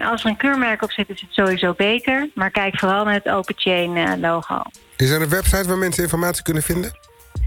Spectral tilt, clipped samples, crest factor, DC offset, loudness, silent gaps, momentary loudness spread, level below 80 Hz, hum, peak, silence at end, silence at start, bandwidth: -4.5 dB/octave; under 0.1%; 16 dB; under 0.1%; -19 LUFS; none; 6 LU; -32 dBFS; none; -4 dBFS; 0 s; 0 s; 18 kHz